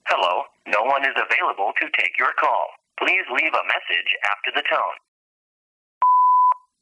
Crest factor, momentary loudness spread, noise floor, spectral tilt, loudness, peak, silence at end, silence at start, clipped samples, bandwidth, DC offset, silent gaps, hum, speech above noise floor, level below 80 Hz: 16 dB; 7 LU; under -90 dBFS; -1 dB/octave; -20 LUFS; -6 dBFS; 0.25 s; 0.05 s; under 0.1%; 9.8 kHz; under 0.1%; 5.08-6.01 s; none; over 68 dB; -80 dBFS